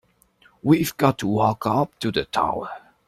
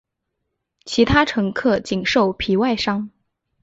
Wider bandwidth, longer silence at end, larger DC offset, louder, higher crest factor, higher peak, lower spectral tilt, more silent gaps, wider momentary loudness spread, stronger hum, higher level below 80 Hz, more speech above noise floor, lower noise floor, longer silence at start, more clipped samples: first, 16 kHz vs 8 kHz; second, 0.3 s vs 0.55 s; neither; second, -22 LUFS vs -19 LUFS; about the same, 20 dB vs 18 dB; about the same, -2 dBFS vs -2 dBFS; about the same, -6 dB/octave vs -5.5 dB/octave; neither; about the same, 8 LU vs 8 LU; neither; second, -54 dBFS vs -42 dBFS; second, 37 dB vs 59 dB; second, -58 dBFS vs -77 dBFS; second, 0.65 s vs 0.85 s; neither